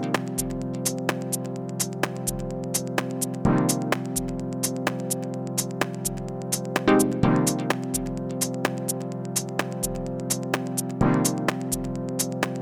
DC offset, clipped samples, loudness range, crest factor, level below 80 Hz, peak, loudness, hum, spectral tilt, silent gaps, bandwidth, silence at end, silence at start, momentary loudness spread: under 0.1%; under 0.1%; 3 LU; 22 dB; -46 dBFS; -4 dBFS; -26 LUFS; none; -4.5 dB/octave; none; over 20 kHz; 0 s; 0 s; 8 LU